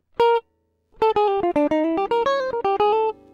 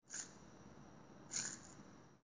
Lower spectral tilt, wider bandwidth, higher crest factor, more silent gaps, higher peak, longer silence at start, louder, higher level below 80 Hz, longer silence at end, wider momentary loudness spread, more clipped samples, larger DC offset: first, -5.5 dB/octave vs -1.5 dB/octave; about the same, 7.6 kHz vs 8 kHz; second, 12 dB vs 26 dB; neither; first, -8 dBFS vs -26 dBFS; first, 0.2 s vs 0 s; first, -21 LUFS vs -46 LUFS; first, -54 dBFS vs -76 dBFS; first, 0.2 s vs 0 s; second, 3 LU vs 18 LU; neither; neither